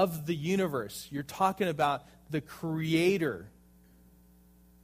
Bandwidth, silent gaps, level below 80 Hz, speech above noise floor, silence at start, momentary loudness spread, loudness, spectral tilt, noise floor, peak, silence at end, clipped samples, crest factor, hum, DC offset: 15.5 kHz; none; -62 dBFS; 29 dB; 0 s; 11 LU; -31 LUFS; -6 dB/octave; -60 dBFS; -14 dBFS; 1.35 s; under 0.1%; 18 dB; none; under 0.1%